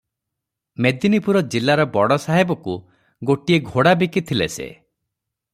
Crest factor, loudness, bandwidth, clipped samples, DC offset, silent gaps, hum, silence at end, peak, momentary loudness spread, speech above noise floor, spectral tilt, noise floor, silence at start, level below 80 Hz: 18 dB; -19 LUFS; 15 kHz; under 0.1%; under 0.1%; none; none; 0.8 s; -2 dBFS; 13 LU; 64 dB; -6 dB/octave; -82 dBFS; 0.8 s; -56 dBFS